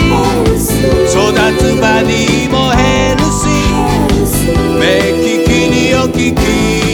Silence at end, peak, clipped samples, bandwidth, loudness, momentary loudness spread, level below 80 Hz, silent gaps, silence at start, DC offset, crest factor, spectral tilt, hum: 0 s; 0 dBFS; under 0.1%; over 20 kHz; -10 LUFS; 2 LU; -20 dBFS; none; 0 s; under 0.1%; 10 dB; -5 dB/octave; none